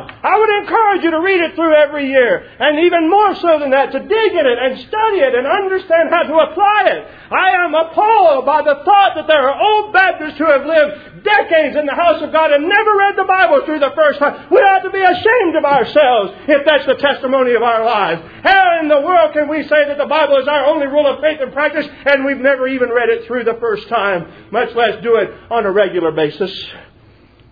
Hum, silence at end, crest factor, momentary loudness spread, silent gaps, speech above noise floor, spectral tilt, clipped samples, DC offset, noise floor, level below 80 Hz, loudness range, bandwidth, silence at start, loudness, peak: none; 0.7 s; 12 dB; 6 LU; none; 33 dB; -6.5 dB/octave; under 0.1%; under 0.1%; -45 dBFS; -52 dBFS; 4 LU; 5.4 kHz; 0 s; -13 LUFS; 0 dBFS